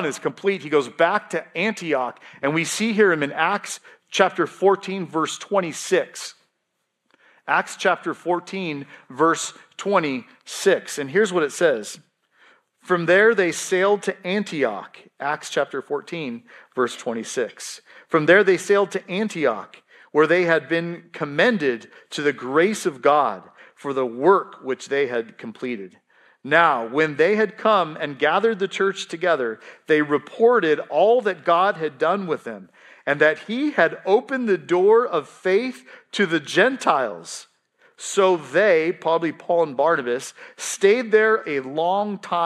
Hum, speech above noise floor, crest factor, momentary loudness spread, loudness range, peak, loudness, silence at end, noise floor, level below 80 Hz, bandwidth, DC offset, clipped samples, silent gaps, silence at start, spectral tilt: none; 54 dB; 20 dB; 14 LU; 5 LU; 0 dBFS; -21 LUFS; 0 s; -76 dBFS; -78 dBFS; 13.5 kHz; under 0.1%; under 0.1%; none; 0 s; -4 dB/octave